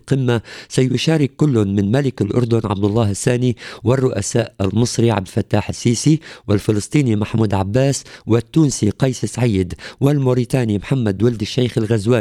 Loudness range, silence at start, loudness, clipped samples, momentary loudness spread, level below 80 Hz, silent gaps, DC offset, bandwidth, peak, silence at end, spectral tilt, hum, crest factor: 1 LU; 0.05 s; -18 LUFS; under 0.1%; 4 LU; -46 dBFS; none; under 0.1%; 14 kHz; -2 dBFS; 0 s; -6 dB/octave; none; 16 dB